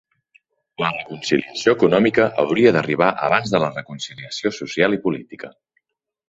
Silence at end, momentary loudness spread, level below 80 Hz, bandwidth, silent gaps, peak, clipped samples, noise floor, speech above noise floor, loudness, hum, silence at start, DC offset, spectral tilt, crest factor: 0.8 s; 14 LU; -58 dBFS; 8 kHz; none; -2 dBFS; under 0.1%; -71 dBFS; 52 dB; -19 LUFS; none; 0.8 s; under 0.1%; -5.5 dB/octave; 20 dB